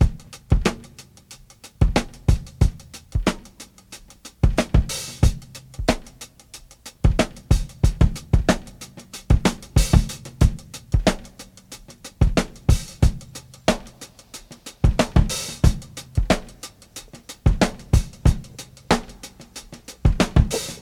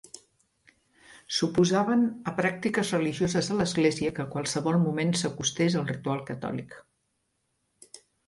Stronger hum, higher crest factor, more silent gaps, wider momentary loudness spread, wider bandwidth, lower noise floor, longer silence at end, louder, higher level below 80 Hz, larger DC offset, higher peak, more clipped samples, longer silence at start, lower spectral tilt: neither; about the same, 22 dB vs 18 dB; neither; first, 21 LU vs 9 LU; first, 16 kHz vs 11.5 kHz; second, -47 dBFS vs -76 dBFS; second, 0.05 s vs 0.3 s; first, -22 LUFS vs -27 LUFS; first, -24 dBFS vs -62 dBFS; neither; first, 0 dBFS vs -10 dBFS; neither; second, 0 s vs 0.15 s; about the same, -5.5 dB/octave vs -5 dB/octave